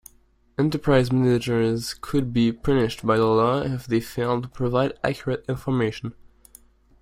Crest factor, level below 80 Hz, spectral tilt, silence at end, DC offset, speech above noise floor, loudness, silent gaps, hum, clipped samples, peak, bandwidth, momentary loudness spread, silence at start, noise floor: 18 dB; -46 dBFS; -7 dB/octave; 0.75 s; under 0.1%; 37 dB; -23 LUFS; none; none; under 0.1%; -4 dBFS; 16 kHz; 8 LU; 0.6 s; -59 dBFS